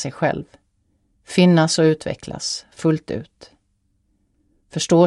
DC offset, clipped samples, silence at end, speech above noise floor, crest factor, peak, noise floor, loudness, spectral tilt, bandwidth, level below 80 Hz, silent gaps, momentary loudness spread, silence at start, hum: under 0.1%; under 0.1%; 0 s; 48 dB; 18 dB; -2 dBFS; -66 dBFS; -20 LUFS; -5.5 dB/octave; 11.5 kHz; -54 dBFS; none; 16 LU; 0 s; none